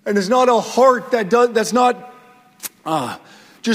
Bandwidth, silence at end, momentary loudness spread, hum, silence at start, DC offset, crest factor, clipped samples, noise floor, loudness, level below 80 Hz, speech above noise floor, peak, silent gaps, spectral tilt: 16 kHz; 0 s; 15 LU; none; 0.05 s; under 0.1%; 16 dB; under 0.1%; -47 dBFS; -16 LUFS; -64 dBFS; 31 dB; 0 dBFS; none; -4 dB/octave